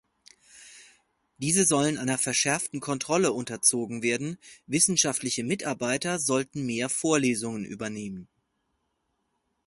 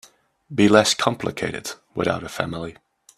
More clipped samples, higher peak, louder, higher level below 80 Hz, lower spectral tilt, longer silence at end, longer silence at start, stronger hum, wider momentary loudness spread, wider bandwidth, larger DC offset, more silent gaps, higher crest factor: neither; second, -6 dBFS vs 0 dBFS; second, -26 LUFS vs -21 LUFS; second, -66 dBFS vs -56 dBFS; about the same, -3 dB/octave vs -4 dB/octave; first, 1.45 s vs 0.45 s; about the same, 0.55 s vs 0.5 s; neither; second, 13 LU vs 16 LU; second, 12 kHz vs 14 kHz; neither; neither; about the same, 22 dB vs 22 dB